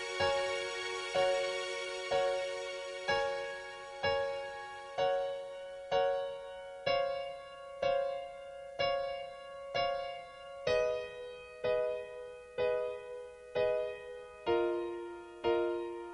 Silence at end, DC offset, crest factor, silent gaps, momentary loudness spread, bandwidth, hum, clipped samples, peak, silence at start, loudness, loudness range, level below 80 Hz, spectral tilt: 0 s; under 0.1%; 18 dB; none; 14 LU; 11.5 kHz; none; under 0.1%; -18 dBFS; 0 s; -36 LUFS; 2 LU; -64 dBFS; -3.5 dB/octave